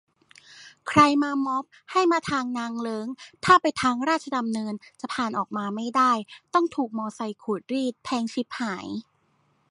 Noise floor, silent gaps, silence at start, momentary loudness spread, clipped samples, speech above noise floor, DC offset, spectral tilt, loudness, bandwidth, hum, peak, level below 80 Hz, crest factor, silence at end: -67 dBFS; none; 0.5 s; 14 LU; under 0.1%; 42 dB; under 0.1%; -4.5 dB/octave; -25 LUFS; 11.5 kHz; none; -4 dBFS; -64 dBFS; 20 dB; 0.7 s